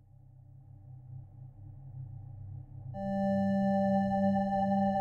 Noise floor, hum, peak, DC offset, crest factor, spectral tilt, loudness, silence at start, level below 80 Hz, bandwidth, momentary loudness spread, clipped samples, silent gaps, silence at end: -56 dBFS; none; -18 dBFS; under 0.1%; 14 dB; -9.5 dB/octave; -30 LUFS; 0.55 s; -58 dBFS; 6.8 kHz; 22 LU; under 0.1%; none; 0 s